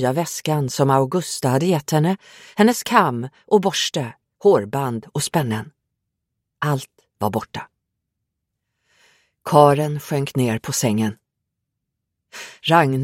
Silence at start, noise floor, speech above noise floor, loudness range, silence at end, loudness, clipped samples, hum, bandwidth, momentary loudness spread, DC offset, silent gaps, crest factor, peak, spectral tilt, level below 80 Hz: 0 s; -79 dBFS; 60 dB; 10 LU; 0 s; -20 LUFS; under 0.1%; none; 16.5 kHz; 15 LU; under 0.1%; none; 20 dB; 0 dBFS; -5 dB/octave; -60 dBFS